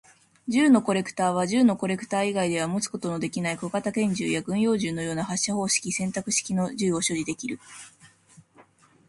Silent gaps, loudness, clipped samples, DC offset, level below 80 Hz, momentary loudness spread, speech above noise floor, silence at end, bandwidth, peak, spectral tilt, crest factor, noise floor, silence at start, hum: none; -25 LUFS; under 0.1%; under 0.1%; -64 dBFS; 8 LU; 32 dB; 1 s; 11.5 kHz; -8 dBFS; -4 dB/octave; 18 dB; -57 dBFS; 0.45 s; none